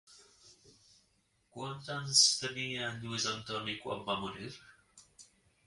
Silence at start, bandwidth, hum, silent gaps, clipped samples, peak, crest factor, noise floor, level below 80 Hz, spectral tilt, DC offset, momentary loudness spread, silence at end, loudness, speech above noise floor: 0.1 s; 11.5 kHz; none; none; under 0.1%; -12 dBFS; 24 dB; -74 dBFS; -70 dBFS; -1.5 dB/octave; under 0.1%; 20 LU; 0.45 s; -32 LUFS; 39 dB